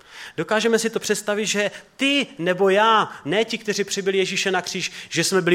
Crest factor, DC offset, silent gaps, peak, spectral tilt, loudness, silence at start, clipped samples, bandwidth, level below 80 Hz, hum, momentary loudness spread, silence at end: 18 dB; under 0.1%; none; -4 dBFS; -3 dB/octave; -21 LUFS; 0.1 s; under 0.1%; 16.5 kHz; -68 dBFS; none; 8 LU; 0 s